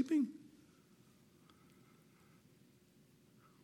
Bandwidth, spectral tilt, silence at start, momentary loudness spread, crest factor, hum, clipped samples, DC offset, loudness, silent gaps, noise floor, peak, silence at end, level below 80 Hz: 14.5 kHz; -6 dB/octave; 0 s; 27 LU; 20 dB; none; under 0.1%; under 0.1%; -38 LUFS; none; -68 dBFS; -24 dBFS; 3.2 s; -88 dBFS